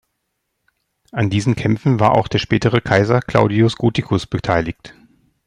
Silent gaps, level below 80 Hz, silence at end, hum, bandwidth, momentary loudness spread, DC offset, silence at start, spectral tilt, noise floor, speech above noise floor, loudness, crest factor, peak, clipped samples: none; -44 dBFS; 0.55 s; none; 10.5 kHz; 6 LU; under 0.1%; 1.15 s; -7 dB/octave; -73 dBFS; 57 dB; -17 LUFS; 16 dB; 0 dBFS; under 0.1%